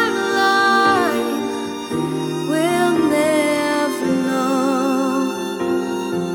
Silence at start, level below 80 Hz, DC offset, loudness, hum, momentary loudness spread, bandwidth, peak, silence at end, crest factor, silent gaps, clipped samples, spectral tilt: 0 s; -58 dBFS; under 0.1%; -18 LUFS; none; 8 LU; 19 kHz; -2 dBFS; 0 s; 16 dB; none; under 0.1%; -4.5 dB/octave